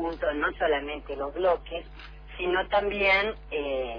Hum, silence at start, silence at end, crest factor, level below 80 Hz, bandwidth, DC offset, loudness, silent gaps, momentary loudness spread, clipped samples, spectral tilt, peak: none; 0 s; 0 s; 16 dB; -46 dBFS; 5.2 kHz; under 0.1%; -27 LUFS; none; 16 LU; under 0.1%; -6.5 dB/octave; -12 dBFS